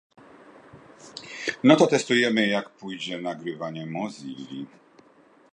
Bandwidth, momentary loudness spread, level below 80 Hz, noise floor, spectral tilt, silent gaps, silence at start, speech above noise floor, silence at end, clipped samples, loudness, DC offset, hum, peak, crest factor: 10.5 kHz; 20 LU; -74 dBFS; -57 dBFS; -4.5 dB/octave; none; 0.75 s; 32 dB; 0.9 s; under 0.1%; -24 LUFS; under 0.1%; none; -2 dBFS; 24 dB